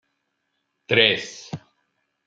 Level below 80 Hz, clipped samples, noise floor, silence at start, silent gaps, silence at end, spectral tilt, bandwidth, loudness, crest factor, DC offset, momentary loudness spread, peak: -68 dBFS; under 0.1%; -75 dBFS; 0.9 s; none; 0.7 s; -3.5 dB/octave; 7.8 kHz; -19 LUFS; 26 dB; under 0.1%; 21 LU; 0 dBFS